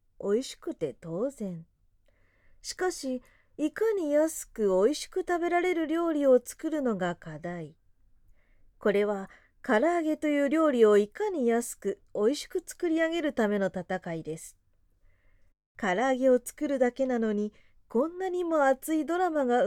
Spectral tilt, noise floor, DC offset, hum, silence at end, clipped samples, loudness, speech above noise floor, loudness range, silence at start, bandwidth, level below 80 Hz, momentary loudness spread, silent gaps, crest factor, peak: -5 dB/octave; -66 dBFS; under 0.1%; none; 0 s; under 0.1%; -28 LUFS; 38 dB; 6 LU; 0.2 s; 17 kHz; -62 dBFS; 13 LU; 15.66-15.75 s; 18 dB; -10 dBFS